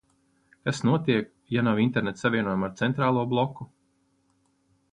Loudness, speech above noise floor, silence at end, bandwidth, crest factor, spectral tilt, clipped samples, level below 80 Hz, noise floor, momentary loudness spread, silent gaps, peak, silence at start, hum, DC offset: -26 LUFS; 44 dB; 1.25 s; 10.5 kHz; 18 dB; -6.5 dB/octave; under 0.1%; -62 dBFS; -69 dBFS; 8 LU; none; -10 dBFS; 0.65 s; none; under 0.1%